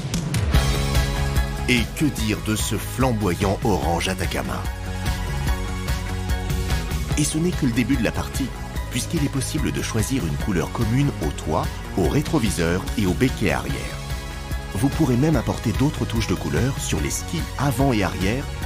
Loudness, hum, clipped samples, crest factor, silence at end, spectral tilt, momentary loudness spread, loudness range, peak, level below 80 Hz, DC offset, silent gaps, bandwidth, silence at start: -23 LUFS; none; under 0.1%; 18 dB; 0 s; -5 dB/octave; 6 LU; 2 LU; -4 dBFS; -30 dBFS; under 0.1%; none; 16 kHz; 0 s